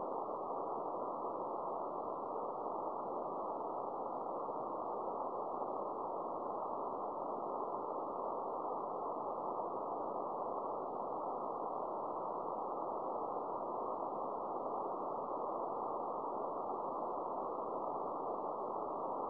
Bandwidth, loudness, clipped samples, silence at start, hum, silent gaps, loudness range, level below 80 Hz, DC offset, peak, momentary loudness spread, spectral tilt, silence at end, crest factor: 5.4 kHz; -41 LUFS; under 0.1%; 0 s; none; none; 1 LU; -80 dBFS; under 0.1%; -28 dBFS; 1 LU; -9 dB/octave; 0 s; 14 dB